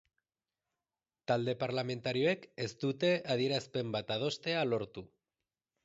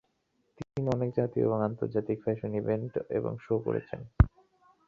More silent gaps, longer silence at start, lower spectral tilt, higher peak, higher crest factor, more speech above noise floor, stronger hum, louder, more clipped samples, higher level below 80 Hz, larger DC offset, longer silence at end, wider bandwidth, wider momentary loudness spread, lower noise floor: neither; first, 1.3 s vs 0.6 s; second, -4 dB/octave vs -10 dB/octave; second, -18 dBFS vs -6 dBFS; second, 18 dB vs 24 dB; first, over 56 dB vs 44 dB; neither; second, -34 LUFS vs -31 LUFS; neither; second, -72 dBFS vs -40 dBFS; neither; first, 0.8 s vs 0.6 s; about the same, 7.6 kHz vs 7.2 kHz; about the same, 6 LU vs 7 LU; first, under -90 dBFS vs -75 dBFS